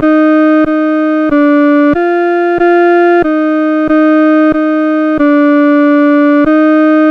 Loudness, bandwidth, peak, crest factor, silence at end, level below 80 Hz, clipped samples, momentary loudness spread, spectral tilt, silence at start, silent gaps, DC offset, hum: -8 LUFS; 5.2 kHz; 0 dBFS; 8 dB; 0 s; -42 dBFS; under 0.1%; 3 LU; -7.5 dB/octave; 0 s; none; under 0.1%; none